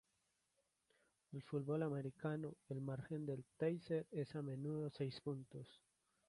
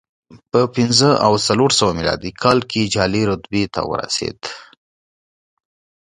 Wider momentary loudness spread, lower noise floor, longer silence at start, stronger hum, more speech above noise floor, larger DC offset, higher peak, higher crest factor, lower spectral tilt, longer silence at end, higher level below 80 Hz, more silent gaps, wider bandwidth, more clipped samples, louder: about the same, 11 LU vs 9 LU; second, -85 dBFS vs under -90 dBFS; first, 1.3 s vs 0.3 s; neither; second, 40 dB vs over 73 dB; neither; second, -28 dBFS vs 0 dBFS; about the same, 18 dB vs 18 dB; first, -8.5 dB/octave vs -4 dB/octave; second, 0.5 s vs 1.55 s; second, -80 dBFS vs -44 dBFS; neither; about the same, 11.5 kHz vs 11.5 kHz; neither; second, -46 LUFS vs -17 LUFS